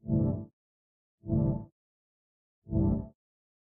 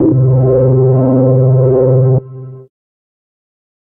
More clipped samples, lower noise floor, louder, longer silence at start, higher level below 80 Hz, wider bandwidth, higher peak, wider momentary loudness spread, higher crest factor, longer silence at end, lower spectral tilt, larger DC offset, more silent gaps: neither; first, under -90 dBFS vs -29 dBFS; second, -32 LUFS vs -10 LUFS; about the same, 0.05 s vs 0 s; second, -44 dBFS vs -38 dBFS; about the same, 1.8 kHz vs 1.7 kHz; second, -16 dBFS vs -2 dBFS; first, 19 LU vs 6 LU; first, 18 dB vs 10 dB; second, 0.55 s vs 1.25 s; second, -15 dB/octave vs -16.5 dB/octave; neither; first, 0.53-1.18 s, 1.72-2.62 s vs none